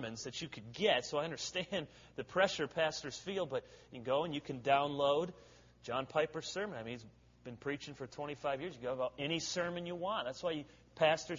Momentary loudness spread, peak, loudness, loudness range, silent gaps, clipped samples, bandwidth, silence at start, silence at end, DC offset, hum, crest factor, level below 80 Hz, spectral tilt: 14 LU; -16 dBFS; -38 LUFS; 5 LU; none; under 0.1%; 7.6 kHz; 0 s; 0 s; under 0.1%; none; 22 dB; -70 dBFS; -4 dB/octave